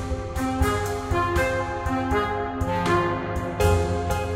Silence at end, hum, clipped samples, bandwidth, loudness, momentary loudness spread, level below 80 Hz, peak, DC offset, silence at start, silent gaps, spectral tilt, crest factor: 0 s; none; under 0.1%; 16.5 kHz; -24 LUFS; 5 LU; -34 dBFS; -8 dBFS; under 0.1%; 0 s; none; -6 dB/octave; 14 dB